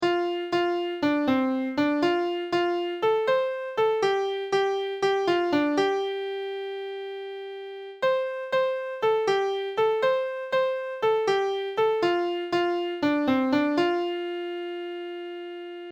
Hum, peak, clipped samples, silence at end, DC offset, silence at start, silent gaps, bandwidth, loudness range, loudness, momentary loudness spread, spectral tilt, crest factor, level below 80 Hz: none; -12 dBFS; under 0.1%; 0 s; under 0.1%; 0 s; none; 9.4 kHz; 3 LU; -26 LUFS; 11 LU; -5 dB/octave; 14 dB; -68 dBFS